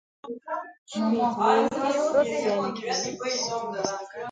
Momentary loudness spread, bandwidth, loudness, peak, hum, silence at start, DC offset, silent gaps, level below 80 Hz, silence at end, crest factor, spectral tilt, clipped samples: 13 LU; 9.4 kHz; -26 LUFS; -6 dBFS; none; 0.25 s; under 0.1%; 0.78-0.86 s; -68 dBFS; 0 s; 20 dB; -3.5 dB/octave; under 0.1%